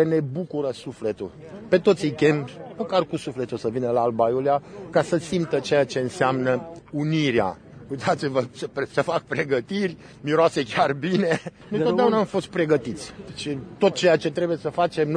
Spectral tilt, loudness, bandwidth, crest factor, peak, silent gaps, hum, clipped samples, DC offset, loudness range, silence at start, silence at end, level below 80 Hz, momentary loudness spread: -6 dB/octave; -24 LUFS; 10.5 kHz; 18 dB; -6 dBFS; none; none; under 0.1%; under 0.1%; 2 LU; 0 s; 0 s; -58 dBFS; 11 LU